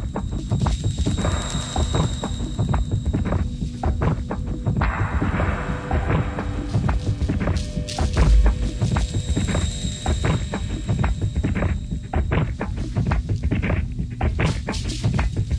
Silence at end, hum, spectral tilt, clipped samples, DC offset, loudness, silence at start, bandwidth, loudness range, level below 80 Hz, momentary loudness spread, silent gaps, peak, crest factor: 0 s; none; -6 dB/octave; under 0.1%; under 0.1%; -24 LUFS; 0 s; 10.5 kHz; 2 LU; -26 dBFS; 5 LU; none; -4 dBFS; 16 dB